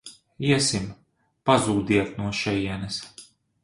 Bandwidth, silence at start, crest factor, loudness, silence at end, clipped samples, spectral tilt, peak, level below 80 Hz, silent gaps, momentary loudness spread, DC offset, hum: 11.5 kHz; 0.05 s; 22 dB; -24 LUFS; 0.4 s; under 0.1%; -4.5 dB/octave; -4 dBFS; -50 dBFS; none; 13 LU; under 0.1%; none